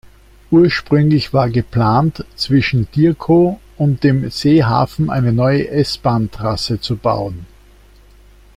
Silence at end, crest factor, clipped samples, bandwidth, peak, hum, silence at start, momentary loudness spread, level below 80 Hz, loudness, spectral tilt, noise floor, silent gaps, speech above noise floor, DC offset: 1.1 s; 14 dB; under 0.1%; 14 kHz; -2 dBFS; 50 Hz at -40 dBFS; 0.5 s; 7 LU; -40 dBFS; -15 LUFS; -7.5 dB/octave; -45 dBFS; none; 30 dB; under 0.1%